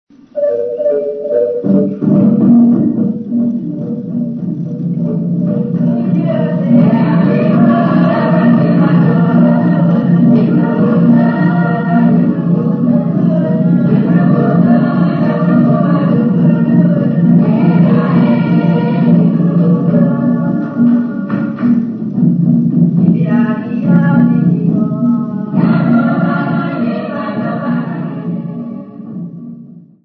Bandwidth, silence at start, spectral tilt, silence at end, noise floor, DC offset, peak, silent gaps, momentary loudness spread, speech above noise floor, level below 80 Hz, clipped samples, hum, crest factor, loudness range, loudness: 4.5 kHz; 0.35 s; -12 dB/octave; 0.25 s; -35 dBFS; under 0.1%; 0 dBFS; none; 9 LU; 24 dB; -52 dBFS; under 0.1%; none; 10 dB; 5 LU; -12 LUFS